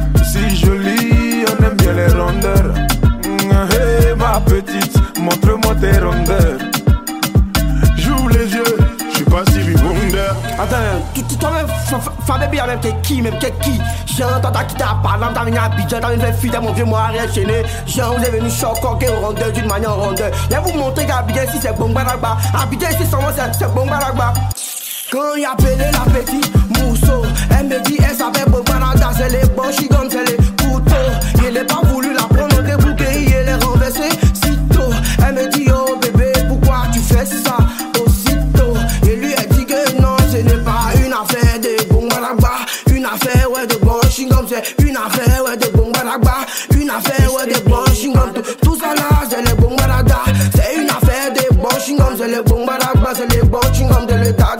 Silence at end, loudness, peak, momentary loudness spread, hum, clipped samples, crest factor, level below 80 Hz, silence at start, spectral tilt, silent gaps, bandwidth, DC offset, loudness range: 0 s; -14 LUFS; 0 dBFS; 4 LU; none; under 0.1%; 12 dB; -18 dBFS; 0 s; -5.5 dB/octave; none; 16.5 kHz; under 0.1%; 3 LU